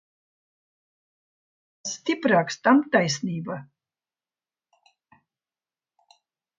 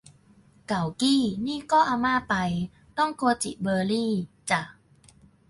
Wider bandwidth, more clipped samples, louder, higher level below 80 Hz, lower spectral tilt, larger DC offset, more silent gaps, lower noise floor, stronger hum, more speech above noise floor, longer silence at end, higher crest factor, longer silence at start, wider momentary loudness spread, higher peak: second, 7.8 kHz vs 11.5 kHz; neither; first, -23 LUFS vs -26 LUFS; second, -74 dBFS vs -58 dBFS; about the same, -4.5 dB/octave vs -4.5 dB/octave; neither; neither; first, under -90 dBFS vs -57 dBFS; neither; first, over 67 dB vs 32 dB; first, 2.95 s vs 0.8 s; first, 24 dB vs 18 dB; first, 1.85 s vs 0.7 s; first, 16 LU vs 9 LU; first, -4 dBFS vs -8 dBFS